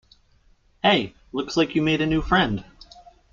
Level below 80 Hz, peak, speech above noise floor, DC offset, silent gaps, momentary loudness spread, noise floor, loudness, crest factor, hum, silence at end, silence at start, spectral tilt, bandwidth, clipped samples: -42 dBFS; -6 dBFS; 37 dB; under 0.1%; none; 11 LU; -59 dBFS; -22 LUFS; 18 dB; none; 0.7 s; 0.85 s; -5.5 dB/octave; 7.4 kHz; under 0.1%